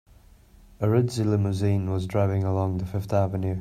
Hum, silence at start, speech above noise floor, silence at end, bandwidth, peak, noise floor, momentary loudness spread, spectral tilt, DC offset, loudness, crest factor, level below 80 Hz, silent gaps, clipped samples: none; 0.8 s; 29 dB; 0 s; 13 kHz; -8 dBFS; -53 dBFS; 4 LU; -8 dB/octave; under 0.1%; -25 LUFS; 16 dB; -52 dBFS; none; under 0.1%